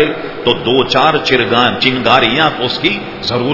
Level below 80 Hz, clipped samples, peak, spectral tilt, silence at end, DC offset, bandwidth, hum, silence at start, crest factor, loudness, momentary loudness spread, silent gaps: -42 dBFS; 0.2%; 0 dBFS; -5 dB/octave; 0 s; under 0.1%; 6 kHz; none; 0 s; 12 dB; -12 LUFS; 7 LU; none